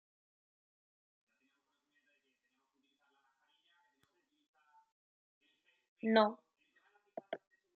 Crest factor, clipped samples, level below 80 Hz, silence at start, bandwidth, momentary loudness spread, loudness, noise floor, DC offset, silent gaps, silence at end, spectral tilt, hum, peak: 28 dB; under 0.1%; under -90 dBFS; 6.05 s; 4.7 kHz; 22 LU; -34 LUFS; -83 dBFS; under 0.1%; none; 0.4 s; -3 dB/octave; none; -16 dBFS